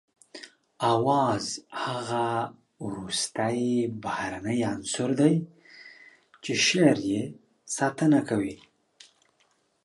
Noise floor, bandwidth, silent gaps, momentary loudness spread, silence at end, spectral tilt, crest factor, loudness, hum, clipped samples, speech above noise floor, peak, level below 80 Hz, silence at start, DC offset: -69 dBFS; 11.5 kHz; none; 18 LU; 1.3 s; -4.5 dB/octave; 20 dB; -26 LUFS; none; under 0.1%; 43 dB; -8 dBFS; -64 dBFS; 0.35 s; under 0.1%